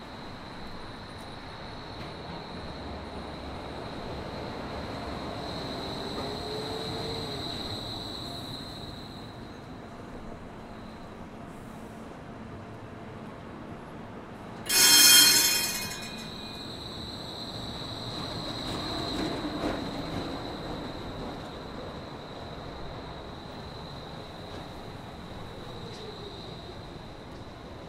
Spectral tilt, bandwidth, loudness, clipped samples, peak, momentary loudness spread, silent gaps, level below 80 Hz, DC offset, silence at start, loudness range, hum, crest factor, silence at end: -1.5 dB/octave; 16 kHz; -27 LUFS; under 0.1%; -4 dBFS; 12 LU; none; -50 dBFS; under 0.1%; 0 s; 22 LU; none; 28 dB; 0 s